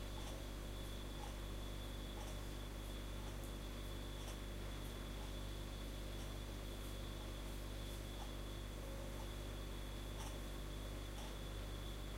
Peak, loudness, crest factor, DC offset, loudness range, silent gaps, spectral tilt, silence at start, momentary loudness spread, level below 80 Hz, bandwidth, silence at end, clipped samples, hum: -36 dBFS; -50 LUFS; 12 dB; under 0.1%; 0 LU; none; -4.5 dB/octave; 0 s; 1 LU; -50 dBFS; 16 kHz; 0 s; under 0.1%; 50 Hz at -50 dBFS